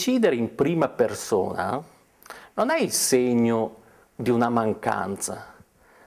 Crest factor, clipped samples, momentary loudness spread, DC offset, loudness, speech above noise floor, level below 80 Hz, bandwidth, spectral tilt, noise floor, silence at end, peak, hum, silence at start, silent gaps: 16 dB; under 0.1%; 12 LU; under 0.1%; -24 LUFS; 31 dB; -58 dBFS; 16 kHz; -4.5 dB/octave; -54 dBFS; 0.55 s; -8 dBFS; none; 0 s; none